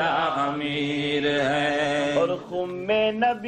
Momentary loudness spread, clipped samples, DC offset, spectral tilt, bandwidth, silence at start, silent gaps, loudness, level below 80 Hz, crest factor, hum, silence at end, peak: 4 LU; under 0.1%; under 0.1%; -5 dB/octave; 9.4 kHz; 0 s; none; -24 LUFS; -58 dBFS; 14 dB; none; 0 s; -10 dBFS